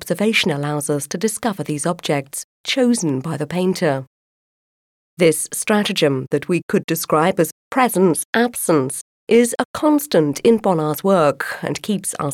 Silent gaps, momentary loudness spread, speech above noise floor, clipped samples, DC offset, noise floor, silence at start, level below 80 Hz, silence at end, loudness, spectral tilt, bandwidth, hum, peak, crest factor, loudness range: 2.44-2.64 s, 4.07-5.17 s, 6.63-6.69 s, 6.84-6.88 s, 7.52-7.71 s, 8.25-8.33 s, 9.01-9.27 s, 9.65-9.74 s; 7 LU; over 72 dB; under 0.1%; under 0.1%; under -90 dBFS; 0 s; -62 dBFS; 0 s; -18 LUFS; -4.5 dB/octave; 17.5 kHz; none; -4 dBFS; 16 dB; 4 LU